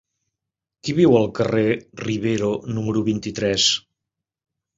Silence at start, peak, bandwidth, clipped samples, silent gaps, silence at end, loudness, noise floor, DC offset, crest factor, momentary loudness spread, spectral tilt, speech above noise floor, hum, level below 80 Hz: 0.85 s; -4 dBFS; 8 kHz; under 0.1%; none; 1 s; -20 LUFS; -85 dBFS; under 0.1%; 18 dB; 9 LU; -4.5 dB/octave; 65 dB; none; -52 dBFS